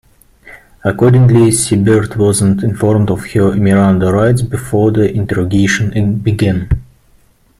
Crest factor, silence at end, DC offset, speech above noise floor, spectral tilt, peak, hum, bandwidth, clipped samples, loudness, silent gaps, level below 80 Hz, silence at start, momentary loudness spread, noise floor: 12 dB; 0.75 s; under 0.1%; 38 dB; -6.5 dB/octave; 0 dBFS; none; 14.5 kHz; under 0.1%; -12 LUFS; none; -34 dBFS; 0.45 s; 7 LU; -49 dBFS